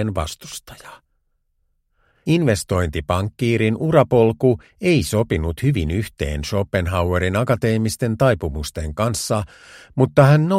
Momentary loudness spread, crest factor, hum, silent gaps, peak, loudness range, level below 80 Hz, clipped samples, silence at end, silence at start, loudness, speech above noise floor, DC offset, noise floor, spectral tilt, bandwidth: 11 LU; 20 dB; none; none; 0 dBFS; 4 LU; -36 dBFS; under 0.1%; 0 s; 0 s; -19 LUFS; 49 dB; under 0.1%; -67 dBFS; -6.5 dB/octave; 16 kHz